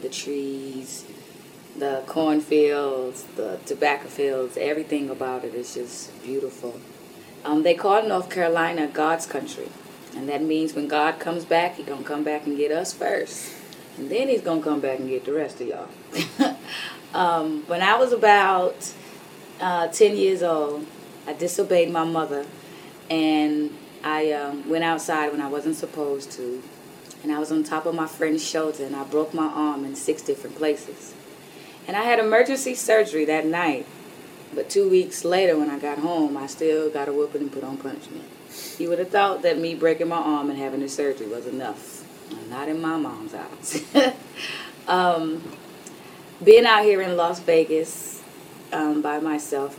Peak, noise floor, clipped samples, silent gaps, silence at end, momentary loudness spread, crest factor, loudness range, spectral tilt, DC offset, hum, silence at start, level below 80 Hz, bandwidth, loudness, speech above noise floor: 0 dBFS; -44 dBFS; under 0.1%; none; 0 s; 19 LU; 24 dB; 7 LU; -4 dB/octave; under 0.1%; none; 0 s; -74 dBFS; 16.5 kHz; -23 LUFS; 21 dB